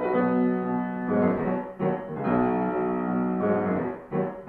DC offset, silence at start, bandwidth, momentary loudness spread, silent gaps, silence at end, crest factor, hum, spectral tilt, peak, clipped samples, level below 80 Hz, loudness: under 0.1%; 0 s; 4.3 kHz; 6 LU; none; 0 s; 16 dB; none; -11 dB/octave; -10 dBFS; under 0.1%; -56 dBFS; -26 LUFS